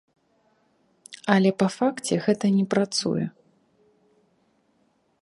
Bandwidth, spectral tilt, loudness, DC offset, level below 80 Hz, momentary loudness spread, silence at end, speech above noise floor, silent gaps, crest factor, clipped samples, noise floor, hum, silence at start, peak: 11.5 kHz; -5.5 dB/octave; -24 LUFS; under 0.1%; -70 dBFS; 11 LU; 1.95 s; 45 dB; none; 24 dB; under 0.1%; -67 dBFS; none; 1.1 s; -2 dBFS